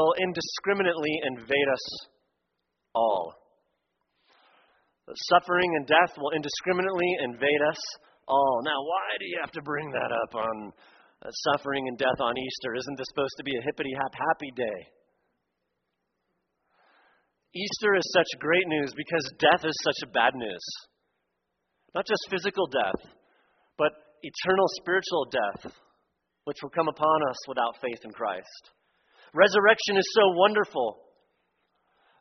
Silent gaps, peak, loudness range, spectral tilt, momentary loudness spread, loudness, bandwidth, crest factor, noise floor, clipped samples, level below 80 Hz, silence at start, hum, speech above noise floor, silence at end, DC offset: none; -4 dBFS; 8 LU; -1.5 dB/octave; 14 LU; -27 LUFS; 6.4 kHz; 24 dB; -80 dBFS; under 0.1%; -68 dBFS; 0 s; none; 53 dB; 1.25 s; under 0.1%